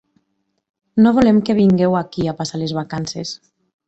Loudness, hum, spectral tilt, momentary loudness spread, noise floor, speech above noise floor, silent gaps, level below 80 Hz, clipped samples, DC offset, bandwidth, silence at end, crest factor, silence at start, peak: -17 LUFS; none; -6.5 dB/octave; 13 LU; -70 dBFS; 54 dB; none; -48 dBFS; under 0.1%; under 0.1%; 8.2 kHz; 0.5 s; 16 dB; 0.95 s; -2 dBFS